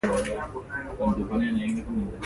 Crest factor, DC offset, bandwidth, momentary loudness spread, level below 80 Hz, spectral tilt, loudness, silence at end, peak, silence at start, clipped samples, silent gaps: 16 dB; under 0.1%; 11.5 kHz; 8 LU; -42 dBFS; -6 dB/octave; -29 LUFS; 0 s; -12 dBFS; 0.05 s; under 0.1%; none